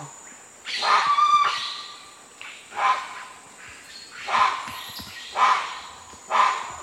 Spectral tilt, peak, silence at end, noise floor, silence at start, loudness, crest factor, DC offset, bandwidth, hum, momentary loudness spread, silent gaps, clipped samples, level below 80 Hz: -0.5 dB/octave; -6 dBFS; 0 s; -45 dBFS; 0 s; -22 LUFS; 20 dB; under 0.1%; 16 kHz; none; 23 LU; none; under 0.1%; -66 dBFS